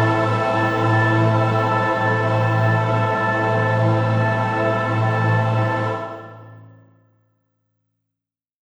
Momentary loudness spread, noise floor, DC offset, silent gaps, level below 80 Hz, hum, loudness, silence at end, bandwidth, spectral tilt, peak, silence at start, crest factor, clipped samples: 4 LU; -86 dBFS; under 0.1%; none; -54 dBFS; none; -19 LUFS; 1.95 s; 8 kHz; -7.5 dB/octave; -6 dBFS; 0 s; 14 dB; under 0.1%